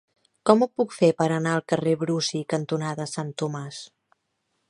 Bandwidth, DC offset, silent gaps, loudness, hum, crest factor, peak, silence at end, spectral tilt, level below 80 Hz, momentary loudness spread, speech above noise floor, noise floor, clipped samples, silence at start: 11.5 kHz; under 0.1%; none; -24 LUFS; none; 24 dB; -2 dBFS; 0.85 s; -5.5 dB/octave; -70 dBFS; 10 LU; 52 dB; -75 dBFS; under 0.1%; 0.45 s